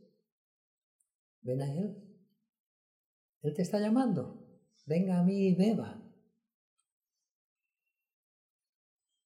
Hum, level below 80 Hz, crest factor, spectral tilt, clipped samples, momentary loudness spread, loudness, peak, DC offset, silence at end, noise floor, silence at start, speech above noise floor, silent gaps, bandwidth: none; -84 dBFS; 18 dB; -8.5 dB/octave; under 0.1%; 17 LU; -32 LUFS; -18 dBFS; under 0.1%; 3.25 s; -89 dBFS; 1.45 s; 59 dB; 2.49-2.53 s, 2.60-3.41 s; 11.5 kHz